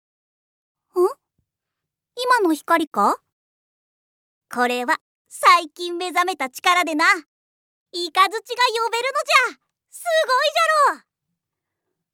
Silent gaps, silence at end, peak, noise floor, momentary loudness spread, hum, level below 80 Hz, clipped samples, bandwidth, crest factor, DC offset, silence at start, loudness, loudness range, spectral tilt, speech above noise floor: 2.87-2.91 s, 3.32-4.41 s, 5.01-5.25 s, 7.28-7.86 s; 1.15 s; 0 dBFS; -84 dBFS; 12 LU; none; -88 dBFS; under 0.1%; 19 kHz; 22 dB; under 0.1%; 0.95 s; -19 LUFS; 4 LU; -1.5 dB/octave; 64 dB